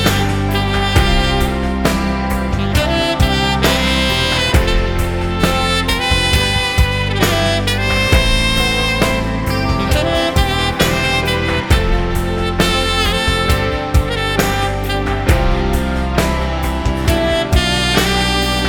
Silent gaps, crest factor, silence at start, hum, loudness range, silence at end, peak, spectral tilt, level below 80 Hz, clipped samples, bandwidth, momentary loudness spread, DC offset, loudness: none; 14 dB; 0 s; none; 2 LU; 0 s; 0 dBFS; -4.5 dB/octave; -20 dBFS; under 0.1%; 20 kHz; 5 LU; under 0.1%; -15 LUFS